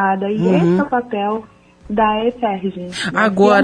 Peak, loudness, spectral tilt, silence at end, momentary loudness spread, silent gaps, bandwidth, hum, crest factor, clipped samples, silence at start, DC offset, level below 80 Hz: -2 dBFS; -17 LUFS; -6.5 dB/octave; 0 s; 10 LU; none; 10.5 kHz; none; 14 dB; under 0.1%; 0 s; under 0.1%; -48 dBFS